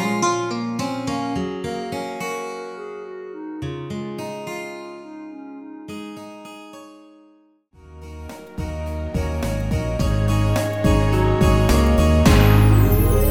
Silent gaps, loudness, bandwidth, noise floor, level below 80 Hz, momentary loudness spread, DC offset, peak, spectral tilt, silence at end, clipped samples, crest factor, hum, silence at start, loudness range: none; -20 LUFS; 19.5 kHz; -55 dBFS; -26 dBFS; 22 LU; under 0.1%; -2 dBFS; -6.5 dB/octave; 0 s; under 0.1%; 18 dB; none; 0 s; 20 LU